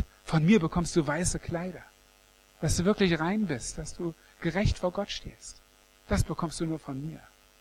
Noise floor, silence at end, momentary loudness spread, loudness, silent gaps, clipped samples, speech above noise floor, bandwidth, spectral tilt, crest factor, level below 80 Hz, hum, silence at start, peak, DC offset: -60 dBFS; 0.4 s; 15 LU; -29 LUFS; none; under 0.1%; 32 dB; 14 kHz; -5.5 dB/octave; 18 dB; -42 dBFS; 50 Hz at -55 dBFS; 0 s; -12 dBFS; under 0.1%